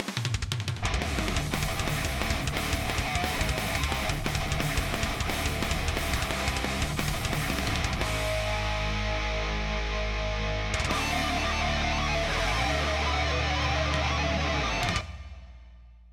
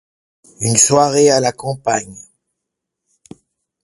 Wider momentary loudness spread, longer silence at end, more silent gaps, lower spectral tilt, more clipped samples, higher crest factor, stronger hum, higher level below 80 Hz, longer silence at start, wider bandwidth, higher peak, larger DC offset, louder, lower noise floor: second, 4 LU vs 11 LU; second, 0 s vs 1.6 s; neither; about the same, -4 dB/octave vs -3.5 dB/octave; neither; about the same, 20 dB vs 18 dB; neither; first, -34 dBFS vs -56 dBFS; second, 0 s vs 0.6 s; first, 19.5 kHz vs 11.5 kHz; second, -10 dBFS vs 0 dBFS; neither; second, -28 LUFS vs -14 LUFS; second, -50 dBFS vs -79 dBFS